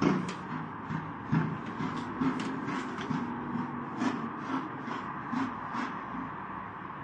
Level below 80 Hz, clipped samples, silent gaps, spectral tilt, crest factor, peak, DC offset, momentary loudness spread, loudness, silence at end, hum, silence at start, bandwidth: -64 dBFS; under 0.1%; none; -6.5 dB/octave; 22 dB; -14 dBFS; under 0.1%; 7 LU; -35 LUFS; 0 s; none; 0 s; 9.6 kHz